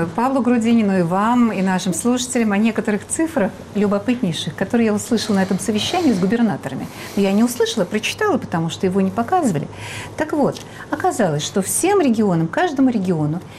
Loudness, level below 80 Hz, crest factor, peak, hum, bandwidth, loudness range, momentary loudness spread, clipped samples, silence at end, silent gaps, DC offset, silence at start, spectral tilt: -19 LUFS; -52 dBFS; 10 dB; -8 dBFS; none; 15 kHz; 3 LU; 7 LU; under 0.1%; 0 s; none; under 0.1%; 0 s; -5 dB/octave